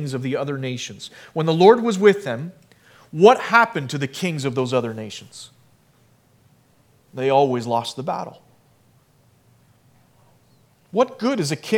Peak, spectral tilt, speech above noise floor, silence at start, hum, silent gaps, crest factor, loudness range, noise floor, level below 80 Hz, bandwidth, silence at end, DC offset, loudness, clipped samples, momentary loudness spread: 0 dBFS; -5.5 dB/octave; 38 dB; 0 s; none; none; 22 dB; 11 LU; -58 dBFS; -70 dBFS; 15.5 kHz; 0 s; under 0.1%; -20 LUFS; under 0.1%; 20 LU